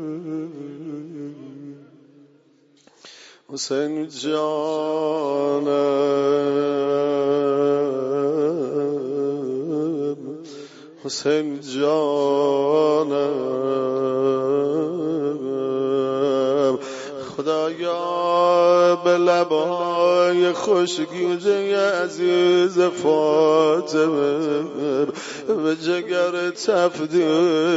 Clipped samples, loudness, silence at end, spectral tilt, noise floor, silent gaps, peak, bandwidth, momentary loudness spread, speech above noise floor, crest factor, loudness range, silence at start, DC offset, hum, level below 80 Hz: under 0.1%; -20 LUFS; 0 s; -5 dB/octave; -57 dBFS; none; -4 dBFS; 8 kHz; 13 LU; 37 dB; 16 dB; 7 LU; 0 s; under 0.1%; none; -72 dBFS